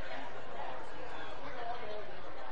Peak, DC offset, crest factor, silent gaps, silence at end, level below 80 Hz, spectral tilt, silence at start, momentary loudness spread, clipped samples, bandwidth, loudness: -24 dBFS; 3%; 14 dB; none; 0 s; -62 dBFS; -5 dB/octave; 0 s; 4 LU; under 0.1%; 8.4 kHz; -45 LUFS